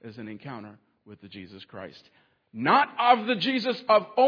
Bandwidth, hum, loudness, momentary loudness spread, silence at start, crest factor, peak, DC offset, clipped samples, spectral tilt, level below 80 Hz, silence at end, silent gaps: 5.4 kHz; none; -23 LUFS; 22 LU; 0.05 s; 20 dB; -6 dBFS; under 0.1%; under 0.1%; -6 dB/octave; -74 dBFS; 0 s; none